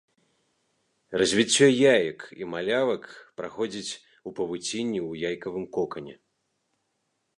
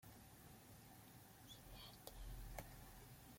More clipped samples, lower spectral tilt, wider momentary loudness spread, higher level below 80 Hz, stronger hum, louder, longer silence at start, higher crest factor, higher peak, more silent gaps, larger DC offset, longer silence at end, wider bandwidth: neither; about the same, -3.5 dB/octave vs -4 dB/octave; first, 19 LU vs 7 LU; about the same, -66 dBFS vs -62 dBFS; neither; first, -25 LUFS vs -59 LUFS; first, 1.1 s vs 0 s; about the same, 22 dB vs 26 dB; first, -6 dBFS vs -32 dBFS; neither; neither; first, 1.25 s vs 0 s; second, 11 kHz vs 16.5 kHz